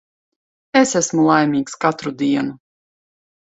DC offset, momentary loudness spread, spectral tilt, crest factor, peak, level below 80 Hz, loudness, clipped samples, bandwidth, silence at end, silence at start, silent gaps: under 0.1%; 7 LU; -4.5 dB/octave; 20 dB; 0 dBFS; -62 dBFS; -18 LUFS; under 0.1%; 8.2 kHz; 1.05 s; 0.75 s; none